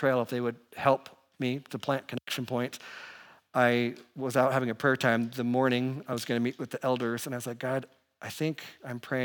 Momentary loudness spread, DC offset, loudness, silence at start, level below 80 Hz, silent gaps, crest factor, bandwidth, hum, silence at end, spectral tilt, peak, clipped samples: 13 LU; under 0.1%; -30 LUFS; 0 s; -80 dBFS; none; 22 dB; 19.5 kHz; none; 0 s; -5.5 dB/octave; -8 dBFS; under 0.1%